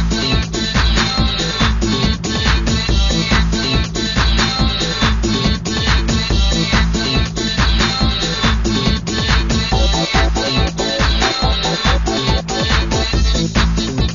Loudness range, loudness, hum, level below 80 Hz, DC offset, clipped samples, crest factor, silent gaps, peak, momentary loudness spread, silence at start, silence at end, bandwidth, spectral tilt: 0 LU; -16 LUFS; none; -18 dBFS; 0.4%; under 0.1%; 14 dB; none; 0 dBFS; 3 LU; 0 s; 0 s; 7.4 kHz; -4 dB/octave